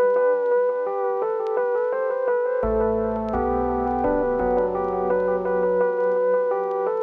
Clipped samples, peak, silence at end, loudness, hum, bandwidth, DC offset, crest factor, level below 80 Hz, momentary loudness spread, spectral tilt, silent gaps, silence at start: under 0.1%; -10 dBFS; 0 s; -22 LUFS; none; 3.6 kHz; under 0.1%; 12 dB; -42 dBFS; 4 LU; -9.5 dB/octave; none; 0 s